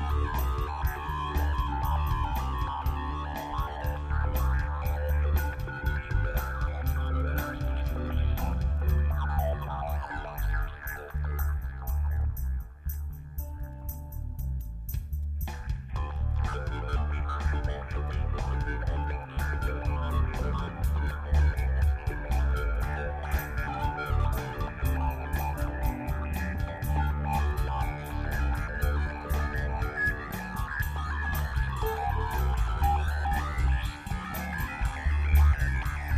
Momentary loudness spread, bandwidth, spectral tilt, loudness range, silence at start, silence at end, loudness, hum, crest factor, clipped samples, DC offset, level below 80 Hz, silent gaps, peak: 7 LU; 15 kHz; -6.5 dB/octave; 4 LU; 0 s; 0 s; -31 LUFS; none; 16 dB; under 0.1%; under 0.1%; -30 dBFS; none; -12 dBFS